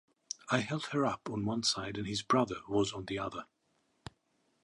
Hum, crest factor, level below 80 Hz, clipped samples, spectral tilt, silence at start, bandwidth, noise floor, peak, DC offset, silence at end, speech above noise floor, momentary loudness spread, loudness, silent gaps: none; 22 dB; -64 dBFS; under 0.1%; -4.5 dB/octave; 0.3 s; 11.5 kHz; -76 dBFS; -14 dBFS; under 0.1%; 1.2 s; 42 dB; 18 LU; -34 LUFS; none